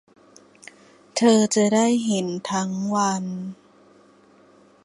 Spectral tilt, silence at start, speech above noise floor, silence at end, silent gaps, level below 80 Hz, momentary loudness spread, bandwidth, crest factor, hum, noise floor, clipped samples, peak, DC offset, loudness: -4.5 dB/octave; 1.15 s; 33 dB; 1.3 s; none; -68 dBFS; 13 LU; 11.5 kHz; 18 dB; none; -54 dBFS; under 0.1%; -6 dBFS; under 0.1%; -21 LUFS